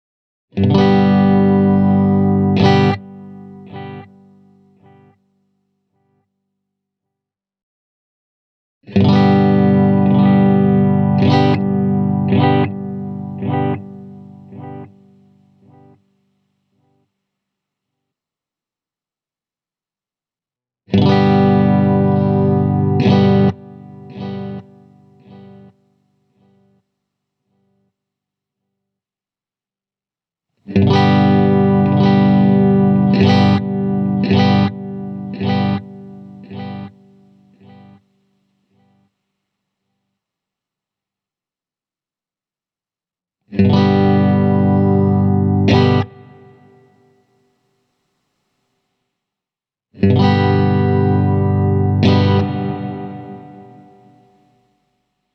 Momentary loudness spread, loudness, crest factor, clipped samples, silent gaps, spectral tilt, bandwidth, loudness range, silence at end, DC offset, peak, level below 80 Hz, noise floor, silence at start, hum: 20 LU; -14 LUFS; 16 dB; under 0.1%; 7.63-8.81 s; -9 dB/octave; 6.2 kHz; 13 LU; 1.75 s; under 0.1%; 0 dBFS; -54 dBFS; under -90 dBFS; 0.55 s; none